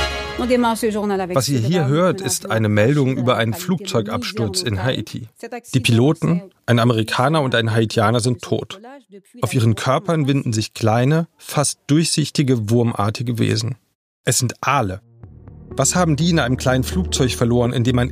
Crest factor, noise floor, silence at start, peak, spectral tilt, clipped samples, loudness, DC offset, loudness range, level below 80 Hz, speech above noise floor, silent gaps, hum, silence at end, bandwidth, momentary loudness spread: 18 dB; -40 dBFS; 0 s; 0 dBFS; -5 dB/octave; under 0.1%; -18 LUFS; under 0.1%; 2 LU; -40 dBFS; 22 dB; 13.95-14.24 s; none; 0 s; 15.5 kHz; 8 LU